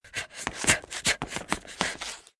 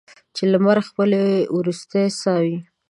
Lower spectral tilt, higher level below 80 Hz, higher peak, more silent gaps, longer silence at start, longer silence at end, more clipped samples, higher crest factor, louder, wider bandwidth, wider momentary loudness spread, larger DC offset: second, -1.5 dB/octave vs -6.5 dB/octave; first, -52 dBFS vs -70 dBFS; about the same, -2 dBFS vs -4 dBFS; neither; second, 0.05 s vs 0.35 s; about the same, 0.2 s vs 0.25 s; neither; first, 28 dB vs 16 dB; second, -28 LUFS vs -19 LUFS; about the same, 12 kHz vs 11.5 kHz; first, 11 LU vs 7 LU; neither